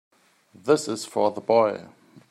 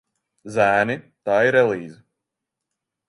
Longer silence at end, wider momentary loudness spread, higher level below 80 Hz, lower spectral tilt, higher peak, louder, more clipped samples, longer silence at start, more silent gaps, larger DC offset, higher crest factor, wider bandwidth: second, 0.1 s vs 1.15 s; about the same, 12 LU vs 12 LU; second, -76 dBFS vs -64 dBFS; second, -4.5 dB/octave vs -6 dB/octave; second, -6 dBFS vs -2 dBFS; second, -23 LUFS vs -20 LUFS; neither; first, 0.65 s vs 0.45 s; neither; neither; about the same, 20 dB vs 20 dB; first, 14.5 kHz vs 11.5 kHz